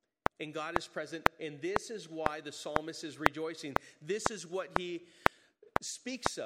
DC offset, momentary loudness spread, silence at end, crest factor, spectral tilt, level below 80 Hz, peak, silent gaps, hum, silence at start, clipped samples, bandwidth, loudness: under 0.1%; 8 LU; 0 s; 36 dB; -3.5 dB/octave; -56 dBFS; 0 dBFS; none; none; 0.4 s; under 0.1%; 16 kHz; -36 LUFS